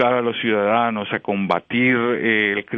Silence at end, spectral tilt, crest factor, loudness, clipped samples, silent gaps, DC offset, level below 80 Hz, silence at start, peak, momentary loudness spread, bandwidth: 0 s; -8 dB/octave; 16 dB; -19 LUFS; under 0.1%; none; under 0.1%; -62 dBFS; 0 s; -4 dBFS; 5 LU; 4.9 kHz